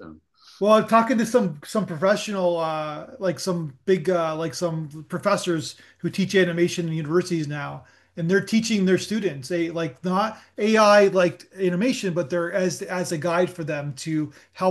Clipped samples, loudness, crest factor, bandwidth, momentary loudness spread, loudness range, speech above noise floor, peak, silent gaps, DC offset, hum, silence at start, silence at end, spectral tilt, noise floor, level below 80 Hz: under 0.1%; -23 LUFS; 18 dB; 12.5 kHz; 10 LU; 4 LU; 27 dB; -4 dBFS; none; under 0.1%; none; 0 s; 0 s; -5.5 dB/octave; -49 dBFS; -70 dBFS